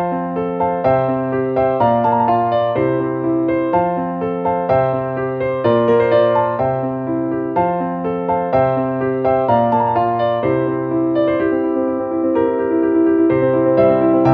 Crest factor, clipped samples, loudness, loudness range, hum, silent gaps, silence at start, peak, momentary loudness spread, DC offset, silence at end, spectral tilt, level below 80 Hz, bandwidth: 14 dB; under 0.1%; -17 LUFS; 1 LU; none; none; 0 s; -2 dBFS; 7 LU; under 0.1%; 0 s; -10 dB/octave; -48 dBFS; 5 kHz